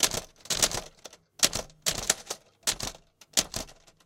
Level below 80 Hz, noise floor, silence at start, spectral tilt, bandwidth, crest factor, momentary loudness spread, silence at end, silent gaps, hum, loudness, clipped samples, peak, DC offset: -50 dBFS; -52 dBFS; 0 s; -0.5 dB/octave; 16.5 kHz; 30 dB; 13 LU; 0.35 s; none; none; -28 LUFS; under 0.1%; -2 dBFS; under 0.1%